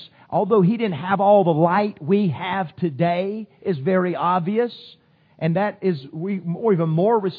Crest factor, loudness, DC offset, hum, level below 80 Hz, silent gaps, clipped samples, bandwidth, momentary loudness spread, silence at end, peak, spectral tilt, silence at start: 18 dB; -21 LUFS; under 0.1%; none; -68 dBFS; none; under 0.1%; 4.9 kHz; 10 LU; 0 s; -4 dBFS; -11 dB/octave; 0 s